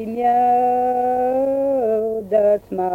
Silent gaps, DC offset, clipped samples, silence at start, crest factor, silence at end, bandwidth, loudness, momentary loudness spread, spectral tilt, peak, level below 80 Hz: none; under 0.1%; under 0.1%; 0 s; 12 dB; 0 s; 16 kHz; -18 LUFS; 4 LU; -8 dB/octave; -6 dBFS; -54 dBFS